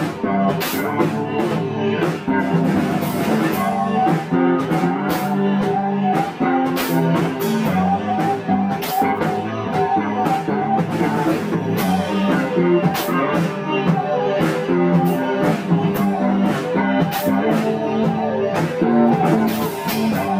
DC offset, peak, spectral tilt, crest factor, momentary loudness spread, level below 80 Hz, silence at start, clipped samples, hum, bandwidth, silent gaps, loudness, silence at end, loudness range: under 0.1%; -4 dBFS; -6.5 dB/octave; 14 dB; 4 LU; -56 dBFS; 0 s; under 0.1%; none; 16 kHz; none; -19 LUFS; 0 s; 1 LU